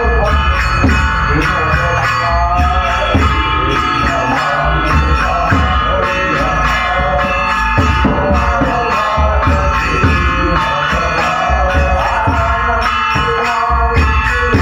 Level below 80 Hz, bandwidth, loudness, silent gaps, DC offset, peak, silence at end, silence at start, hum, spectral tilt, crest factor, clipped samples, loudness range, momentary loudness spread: -18 dBFS; 10 kHz; -13 LUFS; none; under 0.1%; 0 dBFS; 0 s; 0 s; none; -5.5 dB/octave; 12 dB; under 0.1%; 0 LU; 1 LU